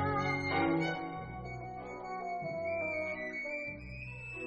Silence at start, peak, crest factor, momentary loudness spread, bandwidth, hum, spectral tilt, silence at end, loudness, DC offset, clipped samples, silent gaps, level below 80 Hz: 0 s; -20 dBFS; 16 dB; 12 LU; 8.8 kHz; none; -6.5 dB/octave; 0 s; -37 LUFS; under 0.1%; under 0.1%; none; -58 dBFS